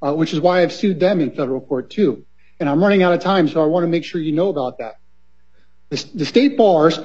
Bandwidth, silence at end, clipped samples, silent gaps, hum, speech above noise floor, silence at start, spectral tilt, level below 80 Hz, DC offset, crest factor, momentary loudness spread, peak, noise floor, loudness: 8 kHz; 0 s; under 0.1%; none; none; 44 dB; 0 s; -6.5 dB/octave; -60 dBFS; 0.7%; 16 dB; 13 LU; 0 dBFS; -61 dBFS; -17 LUFS